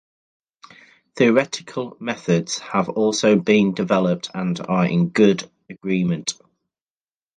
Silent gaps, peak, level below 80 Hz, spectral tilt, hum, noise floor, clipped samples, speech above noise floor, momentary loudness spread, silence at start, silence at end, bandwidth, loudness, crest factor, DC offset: none; -2 dBFS; -62 dBFS; -5.5 dB/octave; none; under -90 dBFS; under 0.1%; over 71 dB; 11 LU; 1.15 s; 1.05 s; 9.6 kHz; -20 LUFS; 18 dB; under 0.1%